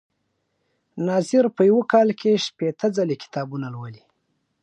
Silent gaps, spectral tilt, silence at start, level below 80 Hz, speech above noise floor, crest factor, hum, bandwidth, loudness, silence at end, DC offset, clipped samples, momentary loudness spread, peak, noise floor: none; -6 dB/octave; 0.95 s; -74 dBFS; 52 dB; 18 dB; none; 10.5 kHz; -21 LUFS; 0.7 s; under 0.1%; under 0.1%; 15 LU; -4 dBFS; -73 dBFS